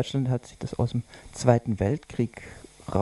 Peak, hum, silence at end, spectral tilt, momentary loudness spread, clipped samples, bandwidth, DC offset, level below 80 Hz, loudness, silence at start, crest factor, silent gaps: -2 dBFS; none; 0 s; -7 dB/octave; 19 LU; under 0.1%; 11.5 kHz; under 0.1%; -50 dBFS; -27 LUFS; 0 s; 24 dB; none